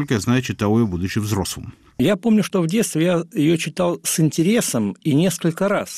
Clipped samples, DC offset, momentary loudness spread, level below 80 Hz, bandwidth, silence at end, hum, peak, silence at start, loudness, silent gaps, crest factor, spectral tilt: under 0.1%; under 0.1%; 5 LU; -48 dBFS; 15.5 kHz; 0 s; none; -8 dBFS; 0 s; -19 LUFS; none; 12 dB; -5.5 dB/octave